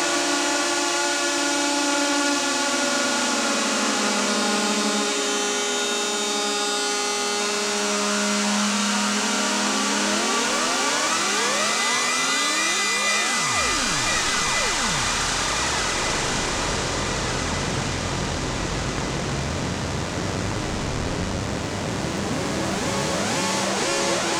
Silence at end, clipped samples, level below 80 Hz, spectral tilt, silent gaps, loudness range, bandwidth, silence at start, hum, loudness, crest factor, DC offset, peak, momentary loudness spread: 0 s; under 0.1%; -42 dBFS; -2 dB/octave; none; 6 LU; over 20 kHz; 0 s; none; -22 LUFS; 18 dB; under 0.1%; -6 dBFS; 6 LU